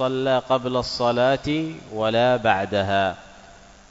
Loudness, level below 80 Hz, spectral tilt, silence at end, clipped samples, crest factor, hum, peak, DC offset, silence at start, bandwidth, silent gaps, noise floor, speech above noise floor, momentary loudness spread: -22 LUFS; -50 dBFS; -5.5 dB/octave; 0.4 s; under 0.1%; 18 dB; none; -4 dBFS; under 0.1%; 0 s; 8 kHz; none; -47 dBFS; 25 dB; 7 LU